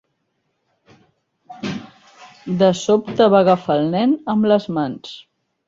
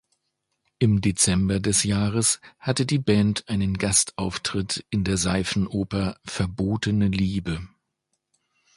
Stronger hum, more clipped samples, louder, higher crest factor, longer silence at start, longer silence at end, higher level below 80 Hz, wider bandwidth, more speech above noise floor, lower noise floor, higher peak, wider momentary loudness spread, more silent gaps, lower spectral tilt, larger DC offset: neither; neither; first, -17 LUFS vs -23 LUFS; about the same, 18 dB vs 20 dB; first, 1.5 s vs 0.8 s; second, 0.45 s vs 1.1 s; second, -60 dBFS vs -42 dBFS; second, 7.8 kHz vs 11.5 kHz; about the same, 54 dB vs 54 dB; second, -71 dBFS vs -78 dBFS; about the same, -2 dBFS vs -4 dBFS; first, 19 LU vs 7 LU; neither; first, -6.5 dB/octave vs -4.5 dB/octave; neither